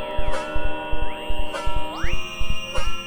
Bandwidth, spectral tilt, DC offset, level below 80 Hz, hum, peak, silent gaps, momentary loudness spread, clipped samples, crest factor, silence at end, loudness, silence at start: 10.5 kHz; -4.5 dB/octave; under 0.1%; -26 dBFS; none; -8 dBFS; none; 2 LU; under 0.1%; 10 dB; 0 s; -29 LUFS; 0 s